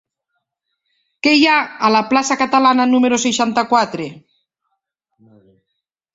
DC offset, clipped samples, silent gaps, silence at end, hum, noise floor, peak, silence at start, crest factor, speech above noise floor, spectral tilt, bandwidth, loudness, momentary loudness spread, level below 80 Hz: under 0.1%; under 0.1%; none; 1.95 s; none; -77 dBFS; 0 dBFS; 1.25 s; 16 dB; 62 dB; -3 dB/octave; 8 kHz; -14 LUFS; 7 LU; -60 dBFS